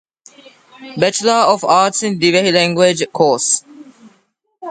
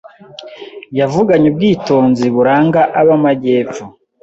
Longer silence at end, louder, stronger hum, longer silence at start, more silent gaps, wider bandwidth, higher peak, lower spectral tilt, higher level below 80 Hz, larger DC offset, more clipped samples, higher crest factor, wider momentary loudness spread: second, 0 s vs 0.35 s; about the same, -13 LUFS vs -12 LUFS; neither; first, 0.8 s vs 0.4 s; neither; first, 9.6 kHz vs 7.8 kHz; about the same, 0 dBFS vs 0 dBFS; second, -3 dB/octave vs -7.5 dB/octave; second, -62 dBFS vs -50 dBFS; neither; neither; about the same, 16 dB vs 12 dB; second, 6 LU vs 19 LU